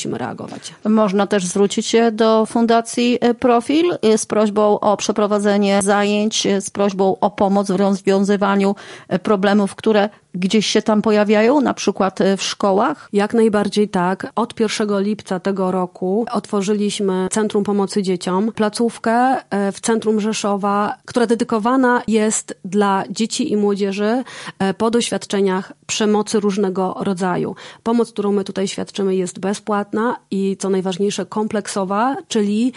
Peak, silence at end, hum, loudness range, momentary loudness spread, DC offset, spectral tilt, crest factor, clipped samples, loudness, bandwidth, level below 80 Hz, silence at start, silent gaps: -2 dBFS; 0.05 s; none; 4 LU; 6 LU; under 0.1%; -5 dB/octave; 14 dB; under 0.1%; -18 LUFS; 11.5 kHz; -60 dBFS; 0 s; none